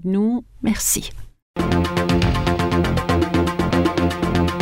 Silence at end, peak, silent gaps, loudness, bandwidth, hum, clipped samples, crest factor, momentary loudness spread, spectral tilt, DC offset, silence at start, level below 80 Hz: 0 s; -6 dBFS; 1.42-1.54 s; -20 LUFS; 16 kHz; none; under 0.1%; 14 dB; 5 LU; -5 dB/octave; under 0.1%; 0 s; -32 dBFS